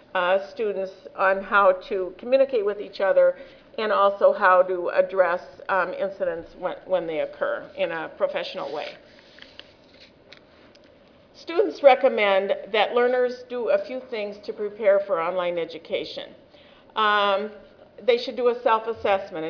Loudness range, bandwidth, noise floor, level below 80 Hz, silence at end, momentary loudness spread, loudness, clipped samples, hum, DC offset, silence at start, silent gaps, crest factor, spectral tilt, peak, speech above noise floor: 9 LU; 5.4 kHz; -53 dBFS; -64 dBFS; 0 s; 13 LU; -23 LUFS; under 0.1%; none; under 0.1%; 0.15 s; none; 22 dB; -5 dB/octave; -2 dBFS; 30 dB